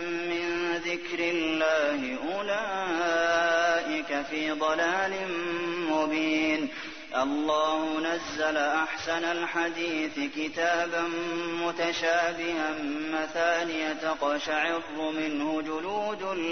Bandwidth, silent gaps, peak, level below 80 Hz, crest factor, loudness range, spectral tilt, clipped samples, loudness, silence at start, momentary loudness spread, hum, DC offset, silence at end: 6.6 kHz; none; -12 dBFS; -64 dBFS; 16 dB; 2 LU; -3 dB/octave; under 0.1%; -28 LUFS; 0 s; 6 LU; none; 0.3%; 0 s